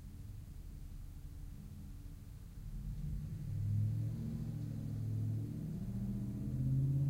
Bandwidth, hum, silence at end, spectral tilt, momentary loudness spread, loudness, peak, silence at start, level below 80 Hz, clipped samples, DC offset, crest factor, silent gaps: 16 kHz; none; 0 s; -9 dB/octave; 15 LU; -42 LUFS; -26 dBFS; 0 s; -50 dBFS; under 0.1%; under 0.1%; 14 dB; none